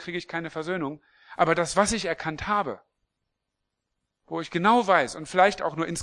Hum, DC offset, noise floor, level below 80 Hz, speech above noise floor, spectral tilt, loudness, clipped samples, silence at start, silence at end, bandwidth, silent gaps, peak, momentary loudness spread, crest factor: none; under 0.1%; -82 dBFS; -56 dBFS; 57 dB; -4 dB/octave; -25 LUFS; under 0.1%; 0 s; 0 s; 12 kHz; none; -4 dBFS; 13 LU; 22 dB